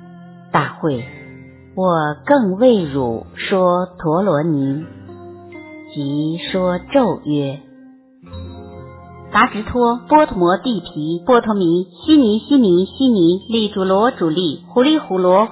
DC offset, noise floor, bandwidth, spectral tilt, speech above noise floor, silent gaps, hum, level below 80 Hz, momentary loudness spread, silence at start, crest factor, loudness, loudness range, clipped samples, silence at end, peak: under 0.1%; -44 dBFS; 4 kHz; -10.5 dB/octave; 29 dB; none; none; -46 dBFS; 21 LU; 0.05 s; 16 dB; -16 LUFS; 6 LU; under 0.1%; 0 s; 0 dBFS